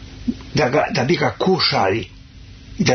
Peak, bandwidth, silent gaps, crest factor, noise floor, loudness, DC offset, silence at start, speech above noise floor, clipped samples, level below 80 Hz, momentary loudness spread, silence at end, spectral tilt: -2 dBFS; 6.6 kHz; none; 16 dB; -40 dBFS; -19 LUFS; under 0.1%; 0 s; 23 dB; under 0.1%; -42 dBFS; 12 LU; 0 s; -5 dB/octave